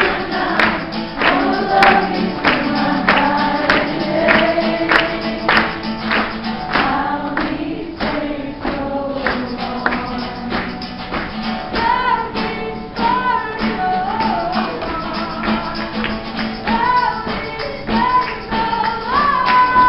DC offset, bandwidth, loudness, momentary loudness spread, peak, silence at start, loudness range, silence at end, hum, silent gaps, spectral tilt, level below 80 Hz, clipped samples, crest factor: under 0.1%; 9.6 kHz; -17 LUFS; 10 LU; 0 dBFS; 0 s; 6 LU; 0 s; none; none; -6.5 dB/octave; -38 dBFS; under 0.1%; 16 dB